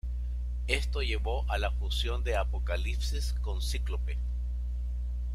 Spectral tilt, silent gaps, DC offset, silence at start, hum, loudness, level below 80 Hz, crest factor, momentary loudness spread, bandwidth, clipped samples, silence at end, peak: -4.5 dB/octave; none; under 0.1%; 0.05 s; 60 Hz at -30 dBFS; -33 LUFS; -32 dBFS; 20 dB; 5 LU; 12.5 kHz; under 0.1%; 0 s; -10 dBFS